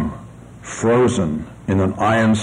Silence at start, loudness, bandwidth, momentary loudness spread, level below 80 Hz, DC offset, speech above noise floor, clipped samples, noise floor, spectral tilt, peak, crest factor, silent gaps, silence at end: 0 s; -18 LUFS; 11 kHz; 17 LU; -44 dBFS; under 0.1%; 21 dB; under 0.1%; -38 dBFS; -6 dB/octave; -6 dBFS; 12 dB; none; 0 s